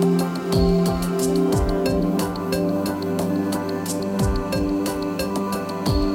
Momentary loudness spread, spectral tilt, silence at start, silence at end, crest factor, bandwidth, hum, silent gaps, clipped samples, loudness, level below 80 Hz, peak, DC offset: 5 LU; -6 dB/octave; 0 s; 0 s; 14 dB; 17 kHz; none; none; under 0.1%; -22 LUFS; -32 dBFS; -8 dBFS; under 0.1%